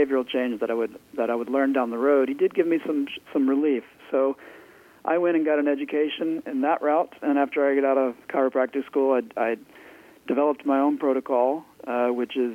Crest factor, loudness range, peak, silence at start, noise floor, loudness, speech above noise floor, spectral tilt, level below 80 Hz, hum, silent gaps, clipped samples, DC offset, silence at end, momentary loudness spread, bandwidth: 16 dB; 2 LU; -8 dBFS; 0 s; -49 dBFS; -24 LUFS; 25 dB; -6.5 dB/octave; -74 dBFS; none; none; under 0.1%; under 0.1%; 0 s; 7 LU; 5.6 kHz